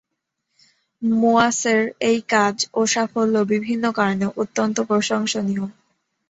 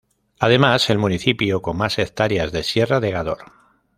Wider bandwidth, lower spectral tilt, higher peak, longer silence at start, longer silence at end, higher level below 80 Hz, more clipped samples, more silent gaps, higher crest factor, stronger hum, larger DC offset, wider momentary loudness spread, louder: second, 8.2 kHz vs 15.5 kHz; second, -4 dB/octave vs -5.5 dB/octave; about the same, -2 dBFS vs 0 dBFS; first, 1 s vs 0.4 s; about the same, 0.6 s vs 0.55 s; second, -62 dBFS vs -46 dBFS; neither; neither; about the same, 18 dB vs 20 dB; neither; neither; about the same, 6 LU vs 8 LU; about the same, -20 LUFS vs -19 LUFS